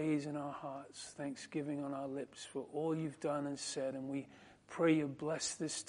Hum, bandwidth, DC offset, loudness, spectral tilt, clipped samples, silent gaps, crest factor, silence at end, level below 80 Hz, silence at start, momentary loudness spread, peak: none; 11 kHz; under 0.1%; -40 LUFS; -4.5 dB/octave; under 0.1%; none; 20 dB; 0 s; -78 dBFS; 0 s; 12 LU; -20 dBFS